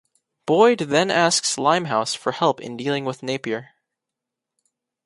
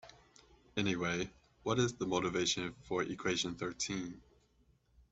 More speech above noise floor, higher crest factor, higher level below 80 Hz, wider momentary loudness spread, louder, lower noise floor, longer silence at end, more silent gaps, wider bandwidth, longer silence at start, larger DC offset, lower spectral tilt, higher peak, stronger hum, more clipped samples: first, 64 dB vs 35 dB; about the same, 20 dB vs 20 dB; about the same, -68 dBFS vs -64 dBFS; about the same, 11 LU vs 9 LU; first, -20 LUFS vs -36 LUFS; first, -85 dBFS vs -71 dBFS; first, 1.4 s vs 0.95 s; neither; first, 11.5 kHz vs 8.2 kHz; first, 0.45 s vs 0.05 s; neither; about the same, -3.5 dB/octave vs -4 dB/octave; first, -2 dBFS vs -18 dBFS; neither; neither